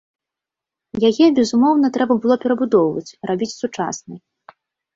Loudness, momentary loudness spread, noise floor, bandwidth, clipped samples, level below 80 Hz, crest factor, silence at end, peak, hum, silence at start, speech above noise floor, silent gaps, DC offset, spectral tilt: -17 LUFS; 11 LU; -86 dBFS; 7.8 kHz; under 0.1%; -60 dBFS; 16 dB; 0.75 s; -2 dBFS; none; 0.95 s; 69 dB; none; under 0.1%; -5.5 dB/octave